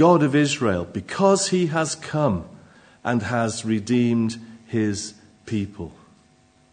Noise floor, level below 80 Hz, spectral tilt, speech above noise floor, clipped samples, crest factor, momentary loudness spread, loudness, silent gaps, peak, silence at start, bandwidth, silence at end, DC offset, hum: -57 dBFS; -60 dBFS; -5.5 dB/octave; 36 dB; under 0.1%; 20 dB; 14 LU; -22 LUFS; none; -2 dBFS; 0 s; 9.6 kHz; 0.8 s; under 0.1%; none